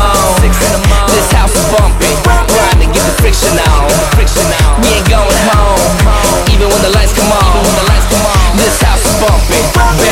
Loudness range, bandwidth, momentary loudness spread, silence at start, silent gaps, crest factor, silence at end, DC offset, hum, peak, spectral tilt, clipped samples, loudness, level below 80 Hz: 0 LU; 16.5 kHz; 1 LU; 0 s; none; 8 dB; 0 s; under 0.1%; none; 0 dBFS; -4 dB/octave; under 0.1%; -9 LUFS; -12 dBFS